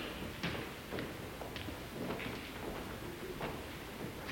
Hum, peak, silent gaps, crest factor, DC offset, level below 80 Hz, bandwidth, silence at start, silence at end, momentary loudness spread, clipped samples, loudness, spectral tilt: none; -24 dBFS; none; 20 dB; under 0.1%; -56 dBFS; 17 kHz; 0 s; 0 s; 4 LU; under 0.1%; -43 LUFS; -5 dB/octave